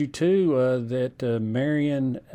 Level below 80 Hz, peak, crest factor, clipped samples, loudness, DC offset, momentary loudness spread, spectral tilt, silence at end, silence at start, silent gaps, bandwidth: -60 dBFS; -12 dBFS; 12 dB; under 0.1%; -24 LUFS; under 0.1%; 6 LU; -7.5 dB/octave; 0 s; 0 s; none; 10.5 kHz